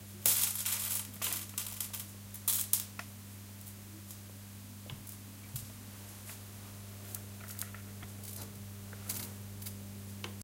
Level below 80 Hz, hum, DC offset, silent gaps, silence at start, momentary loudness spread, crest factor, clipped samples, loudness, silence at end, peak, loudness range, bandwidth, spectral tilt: -66 dBFS; none; under 0.1%; none; 0 s; 17 LU; 36 dB; under 0.1%; -37 LUFS; 0 s; -4 dBFS; 13 LU; 17 kHz; -2 dB/octave